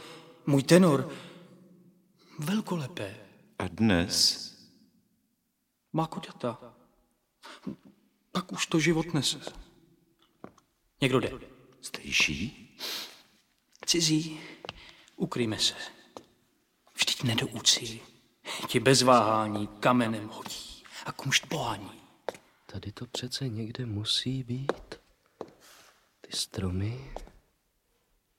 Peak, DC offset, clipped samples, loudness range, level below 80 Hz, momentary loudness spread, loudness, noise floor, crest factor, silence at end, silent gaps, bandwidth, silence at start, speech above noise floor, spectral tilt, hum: -6 dBFS; under 0.1%; under 0.1%; 10 LU; -58 dBFS; 22 LU; -28 LUFS; -78 dBFS; 26 dB; 1.15 s; none; 16.5 kHz; 0 s; 49 dB; -4 dB/octave; none